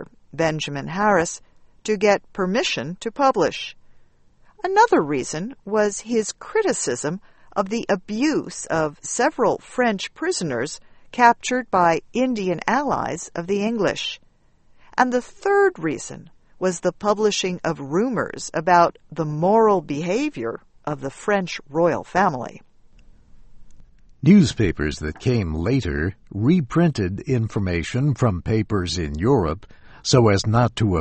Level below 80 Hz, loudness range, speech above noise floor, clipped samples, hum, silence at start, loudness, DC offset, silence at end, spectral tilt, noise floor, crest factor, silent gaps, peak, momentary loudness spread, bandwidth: -44 dBFS; 3 LU; 34 dB; under 0.1%; none; 0 s; -21 LUFS; under 0.1%; 0 s; -5.5 dB/octave; -55 dBFS; 22 dB; none; 0 dBFS; 12 LU; 8.8 kHz